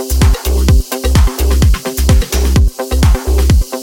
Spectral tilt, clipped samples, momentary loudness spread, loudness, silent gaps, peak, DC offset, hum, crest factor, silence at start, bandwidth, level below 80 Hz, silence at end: -5.5 dB/octave; under 0.1%; 2 LU; -13 LUFS; none; 0 dBFS; under 0.1%; none; 10 dB; 0 s; 17 kHz; -12 dBFS; 0 s